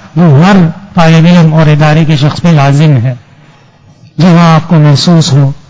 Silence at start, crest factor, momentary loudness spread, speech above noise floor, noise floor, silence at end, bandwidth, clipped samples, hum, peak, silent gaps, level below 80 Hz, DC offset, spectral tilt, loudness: 0.05 s; 6 dB; 6 LU; 35 dB; -39 dBFS; 0.15 s; 8 kHz; 5%; none; 0 dBFS; none; -36 dBFS; under 0.1%; -7 dB/octave; -5 LUFS